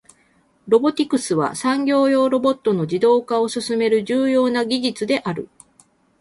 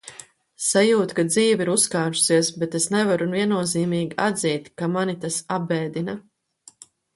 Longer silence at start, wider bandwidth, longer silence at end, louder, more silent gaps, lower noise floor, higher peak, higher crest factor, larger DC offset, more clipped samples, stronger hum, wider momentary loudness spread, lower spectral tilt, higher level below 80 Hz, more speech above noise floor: first, 0.65 s vs 0.05 s; about the same, 11.5 kHz vs 12 kHz; second, 0.75 s vs 0.95 s; first, -19 LUFS vs -22 LUFS; neither; first, -59 dBFS vs -53 dBFS; about the same, -4 dBFS vs -4 dBFS; about the same, 16 dB vs 18 dB; neither; neither; neither; second, 5 LU vs 8 LU; about the same, -5 dB/octave vs -4 dB/octave; about the same, -64 dBFS vs -66 dBFS; first, 41 dB vs 32 dB